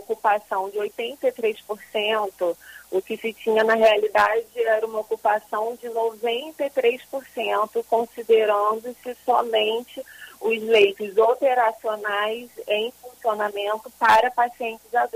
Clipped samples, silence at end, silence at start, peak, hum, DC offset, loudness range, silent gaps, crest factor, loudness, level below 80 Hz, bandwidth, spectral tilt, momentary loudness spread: under 0.1%; 0.05 s; 0 s; -6 dBFS; none; under 0.1%; 3 LU; none; 16 dB; -23 LUFS; -66 dBFS; 15.5 kHz; -3 dB/octave; 12 LU